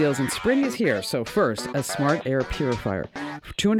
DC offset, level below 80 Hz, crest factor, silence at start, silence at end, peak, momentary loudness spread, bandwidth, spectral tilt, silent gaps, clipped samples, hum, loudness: under 0.1%; -46 dBFS; 14 dB; 0 s; 0 s; -10 dBFS; 7 LU; 17.5 kHz; -5 dB/octave; none; under 0.1%; none; -25 LUFS